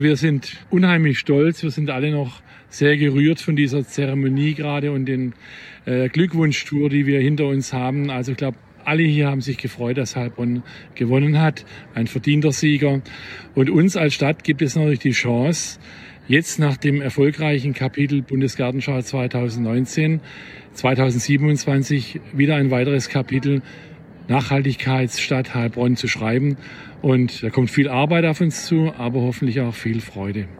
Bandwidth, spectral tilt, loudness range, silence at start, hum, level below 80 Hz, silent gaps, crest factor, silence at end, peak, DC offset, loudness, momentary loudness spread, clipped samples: 13.5 kHz; -6 dB/octave; 2 LU; 0 s; none; -56 dBFS; none; 16 dB; 0 s; -4 dBFS; under 0.1%; -20 LUFS; 9 LU; under 0.1%